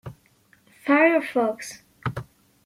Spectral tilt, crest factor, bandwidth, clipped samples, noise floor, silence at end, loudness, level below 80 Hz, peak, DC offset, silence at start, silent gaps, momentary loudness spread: -6 dB/octave; 20 dB; 15.5 kHz; under 0.1%; -60 dBFS; 0.45 s; -23 LUFS; -58 dBFS; -6 dBFS; under 0.1%; 0.05 s; none; 20 LU